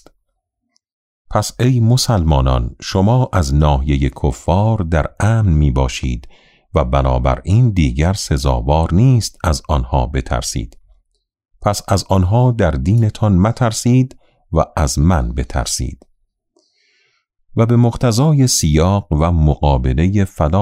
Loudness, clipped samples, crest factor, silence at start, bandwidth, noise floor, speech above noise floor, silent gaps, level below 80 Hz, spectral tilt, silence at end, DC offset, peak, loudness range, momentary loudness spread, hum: -15 LUFS; under 0.1%; 14 dB; 1.3 s; 15.5 kHz; -71 dBFS; 57 dB; none; -24 dBFS; -6 dB/octave; 0 s; under 0.1%; -2 dBFS; 4 LU; 7 LU; none